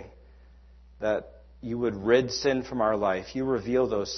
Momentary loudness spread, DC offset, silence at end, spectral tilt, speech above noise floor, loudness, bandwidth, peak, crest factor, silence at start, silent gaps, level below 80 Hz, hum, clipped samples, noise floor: 9 LU; under 0.1%; 0 s; -5 dB/octave; 26 dB; -27 LUFS; 6.4 kHz; -10 dBFS; 18 dB; 0 s; none; -52 dBFS; none; under 0.1%; -52 dBFS